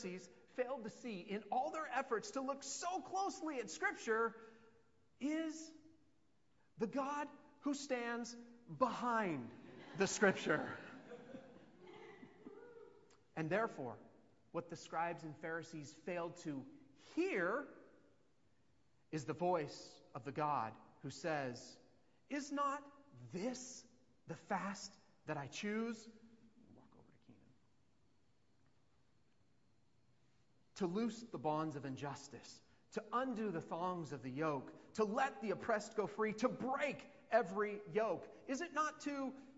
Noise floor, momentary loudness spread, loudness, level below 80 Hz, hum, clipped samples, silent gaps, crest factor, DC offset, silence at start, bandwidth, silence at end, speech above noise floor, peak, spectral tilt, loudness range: -79 dBFS; 18 LU; -42 LUFS; -82 dBFS; none; under 0.1%; none; 26 dB; under 0.1%; 0 s; 7.6 kHz; 0 s; 37 dB; -18 dBFS; -4 dB/octave; 7 LU